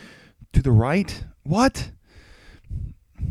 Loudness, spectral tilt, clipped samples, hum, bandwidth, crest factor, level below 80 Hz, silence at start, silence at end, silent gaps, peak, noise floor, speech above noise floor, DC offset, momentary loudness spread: -22 LUFS; -6.5 dB/octave; under 0.1%; none; 12.5 kHz; 20 dB; -34 dBFS; 0 s; 0 s; none; -4 dBFS; -50 dBFS; 30 dB; under 0.1%; 18 LU